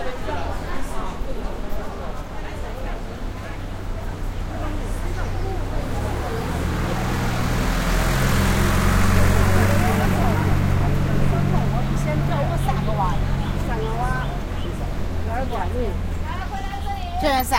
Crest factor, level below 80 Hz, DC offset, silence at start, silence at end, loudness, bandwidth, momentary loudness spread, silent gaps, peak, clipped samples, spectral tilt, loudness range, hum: 18 dB; -26 dBFS; under 0.1%; 0 s; 0 s; -24 LUFS; 16.5 kHz; 12 LU; none; -4 dBFS; under 0.1%; -6 dB/octave; 11 LU; none